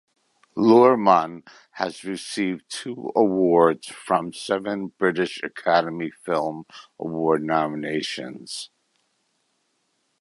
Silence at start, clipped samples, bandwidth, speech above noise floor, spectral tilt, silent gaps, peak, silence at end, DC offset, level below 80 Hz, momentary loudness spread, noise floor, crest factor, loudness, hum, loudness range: 0.55 s; under 0.1%; 11.5 kHz; 49 dB; -5.5 dB/octave; none; -2 dBFS; 1.55 s; under 0.1%; -66 dBFS; 16 LU; -71 dBFS; 20 dB; -22 LUFS; none; 7 LU